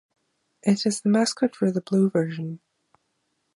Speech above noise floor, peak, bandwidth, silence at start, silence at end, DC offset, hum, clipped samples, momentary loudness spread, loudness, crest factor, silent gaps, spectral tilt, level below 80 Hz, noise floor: 51 dB; -8 dBFS; 11.5 kHz; 0.65 s; 1 s; under 0.1%; none; under 0.1%; 11 LU; -24 LUFS; 18 dB; none; -5.5 dB/octave; -72 dBFS; -74 dBFS